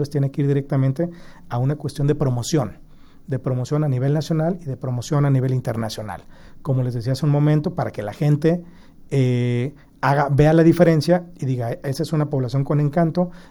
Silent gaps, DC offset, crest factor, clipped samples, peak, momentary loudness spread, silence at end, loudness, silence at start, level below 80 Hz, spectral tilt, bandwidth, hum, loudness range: none; under 0.1%; 18 dB; under 0.1%; -2 dBFS; 11 LU; 0.1 s; -21 LUFS; 0 s; -44 dBFS; -7.5 dB/octave; 12.5 kHz; none; 5 LU